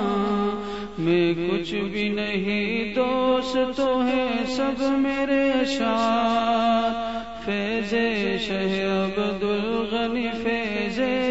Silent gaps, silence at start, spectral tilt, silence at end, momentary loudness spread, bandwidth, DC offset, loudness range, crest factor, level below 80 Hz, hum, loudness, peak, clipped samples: none; 0 s; -5.5 dB/octave; 0 s; 5 LU; 8 kHz; 0.5%; 2 LU; 12 dB; -50 dBFS; none; -24 LUFS; -10 dBFS; under 0.1%